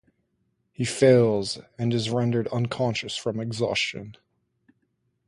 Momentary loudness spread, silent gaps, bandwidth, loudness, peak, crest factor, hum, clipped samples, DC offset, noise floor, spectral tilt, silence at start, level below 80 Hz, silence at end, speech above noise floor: 12 LU; none; 11.5 kHz; -24 LUFS; -6 dBFS; 20 dB; none; under 0.1%; under 0.1%; -73 dBFS; -5.5 dB/octave; 0.8 s; -60 dBFS; 1.15 s; 49 dB